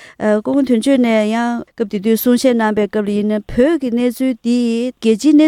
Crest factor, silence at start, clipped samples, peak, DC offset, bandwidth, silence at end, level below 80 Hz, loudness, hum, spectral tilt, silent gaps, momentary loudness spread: 14 dB; 0 s; under 0.1%; 0 dBFS; under 0.1%; 16.5 kHz; 0 s; -44 dBFS; -15 LUFS; none; -5.5 dB/octave; none; 5 LU